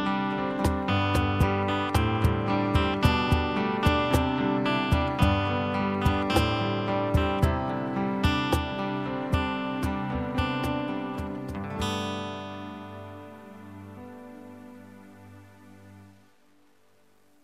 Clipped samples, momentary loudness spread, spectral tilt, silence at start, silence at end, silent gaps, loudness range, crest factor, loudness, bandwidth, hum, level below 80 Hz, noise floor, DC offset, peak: under 0.1%; 19 LU; -6.5 dB/octave; 0 s; 1.35 s; none; 17 LU; 20 dB; -27 LUFS; 15.5 kHz; none; -40 dBFS; -64 dBFS; under 0.1%; -8 dBFS